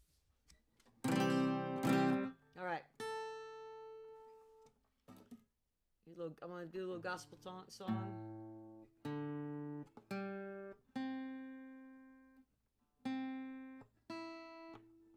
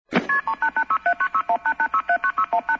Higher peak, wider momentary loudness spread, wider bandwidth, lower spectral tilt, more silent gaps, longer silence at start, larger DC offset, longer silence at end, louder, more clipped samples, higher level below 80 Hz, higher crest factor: second, -22 dBFS vs -6 dBFS; first, 24 LU vs 2 LU; first, 15.5 kHz vs 7.6 kHz; about the same, -6 dB/octave vs -5.5 dB/octave; neither; first, 0.5 s vs 0.1 s; neither; about the same, 0 s vs 0 s; second, -43 LUFS vs -22 LUFS; neither; second, -80 dBFS vs -62 dBFS; first, 22 dB vs 16 dB